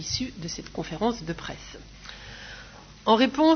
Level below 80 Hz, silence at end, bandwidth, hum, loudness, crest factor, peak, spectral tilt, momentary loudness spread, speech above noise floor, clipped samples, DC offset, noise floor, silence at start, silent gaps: -50 dBFS; 0 s; 6.6 kHz; none; -27 LUFS; 20 dB; -6 dBFS; -4.5 dB/octave; 22 LU; 21 dB; under 0.1%; under 0.1%; -46 dBFS; 0 s; none